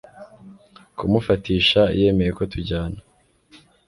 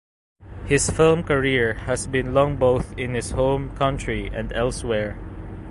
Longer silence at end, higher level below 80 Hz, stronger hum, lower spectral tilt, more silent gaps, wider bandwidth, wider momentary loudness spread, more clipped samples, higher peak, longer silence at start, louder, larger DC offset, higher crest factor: first, 0.9 s vs 0 s; about the same, -40 dBFS vs -36 dBFS; neither; first, -7 dB/octave vs -5 dB/octave; neither; about the same, 11.5 kHz vs 11.5 kHz; first, 15 LU vs 10 LU; neither; about the same, -4 dBFS vs -4 dBFS; second, 0.15 s vs 0.4 s; about the same, -20 LUFS vs -22 LUFS; neither; about the same, 18 dB vs 18 dB